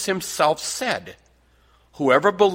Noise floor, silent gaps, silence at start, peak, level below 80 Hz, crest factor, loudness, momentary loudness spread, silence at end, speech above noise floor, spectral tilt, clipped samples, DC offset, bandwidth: -58 dBFS; none; 0 s; -2 dBFS; -60 dBFS; 20 dB; -21 LUFS; 8 LU; 0 s; 37 dB; -3.5 dB/octave; under 0.1%; under 0.1%; 16.5 kHz